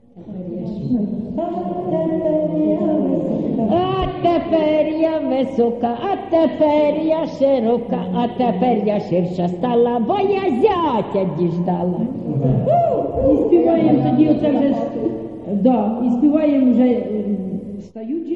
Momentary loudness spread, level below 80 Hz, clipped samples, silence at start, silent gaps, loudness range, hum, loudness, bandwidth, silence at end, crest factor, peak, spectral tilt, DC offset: 9 LU; -44 dBFS; under 0.1%; 0.15 s; none; 2 LU; none; -18 LUFS; 6.8 kHz; 0 s; 14 dB; -2 dBFS; -9.5 dB/octave; 0.1%